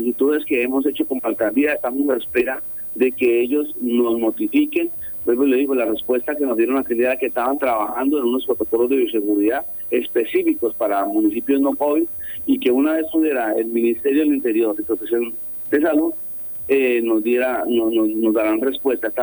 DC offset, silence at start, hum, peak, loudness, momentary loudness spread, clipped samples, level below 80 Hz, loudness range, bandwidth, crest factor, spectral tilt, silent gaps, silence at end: under 0.1%; 0 s; none; -6 dBFS; -19 LUFS; 4 LU; under 0.1%; -56 dBFS; 1 LU; over 20 kHz; 14 dB; -6.5 dB/octave; none; 0 s